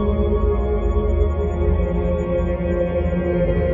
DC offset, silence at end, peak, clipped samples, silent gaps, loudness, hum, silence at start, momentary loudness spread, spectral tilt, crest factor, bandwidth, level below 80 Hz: under 0.1%; 0 s; -6 dBFS; under 0.1%; none; -21 LUFS; none; 0 s; 2 LU; -10 dB/octave; 12 dB; 7.2 kHz; -24 dBFS